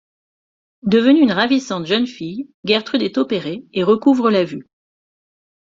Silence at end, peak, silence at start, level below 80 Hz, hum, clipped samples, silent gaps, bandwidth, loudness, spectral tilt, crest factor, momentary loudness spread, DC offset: 1.15 s; -2 dBFS; 0.85 s; -60 dBFS; none; under 0.1%; 2.54-2.63 s; 7.6 kHz; -17 LUFS; -6 dB/octave; 16 dB; 14 LU; under 0.1%